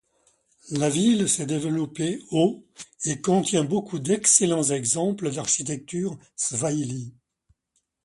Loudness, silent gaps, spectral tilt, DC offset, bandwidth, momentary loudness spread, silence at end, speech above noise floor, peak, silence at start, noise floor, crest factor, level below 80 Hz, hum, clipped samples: -23 LUFS; none; -4 dB/octave; under 0.1%; 12 kHz; 13 LU; 0.95 s; 50 dB; -4 dBFS; 0.65 s; -74 dBFS; 22 dB; -64 dBFS; none; under 0.1%